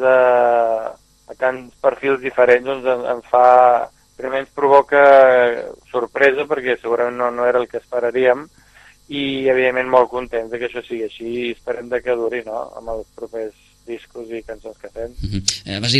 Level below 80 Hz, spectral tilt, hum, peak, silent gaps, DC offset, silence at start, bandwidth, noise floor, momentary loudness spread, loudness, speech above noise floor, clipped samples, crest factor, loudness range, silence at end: -46 dBFS; -4 dB/octave; none; 0 dBFS; none; under 0.1%; 0 s; 12 kHz; -48 dBFS; 19 LU; -17 LUFS; 31 dB; under 0.1%; 18 dB; 12 LU; 0 s